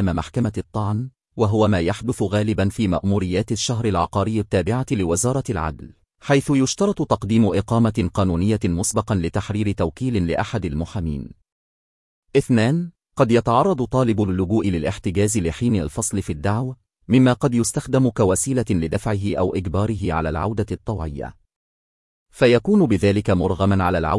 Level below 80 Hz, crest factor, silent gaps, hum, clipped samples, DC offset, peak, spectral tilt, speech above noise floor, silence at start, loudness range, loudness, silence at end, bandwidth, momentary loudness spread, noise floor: -42 dBFS; 18 dB; 11.52-12.23 s, 21.56-22.26 s; none; under 0.1%; under 0.1%; -2 dBFS; -6 dB/octave; over 70 dB; 0 s; 4 LU; -21 LUFS; 0 s; 12 kHz; 9 LU; under -90 dBFS